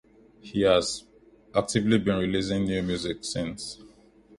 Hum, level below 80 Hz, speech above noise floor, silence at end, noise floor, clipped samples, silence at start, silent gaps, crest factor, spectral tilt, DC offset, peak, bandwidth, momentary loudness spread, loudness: none; -50 dBFS; 30 dB; 0.5 s; -56 dBFS; under 0.1%; 0.45 s; none; 20 dB; -5 dB/octave; under 0.1%; -8 dBFS; 11.5 kHz; 13 LU; -27 LUFS